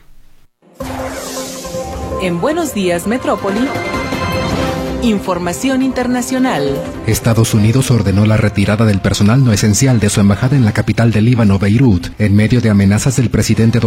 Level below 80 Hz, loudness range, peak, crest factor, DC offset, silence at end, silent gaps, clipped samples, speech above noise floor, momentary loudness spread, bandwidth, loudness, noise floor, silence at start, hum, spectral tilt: -34 dBFS; 6 LU; 0 dBFS; 12 dB; under 0.1%; 0 s; none; under 0.1%; 32 dB; 11 LU; 15.5 kHz; -13 LUFS; -43 dBFS; 0.8 s; none; -6 dB/octave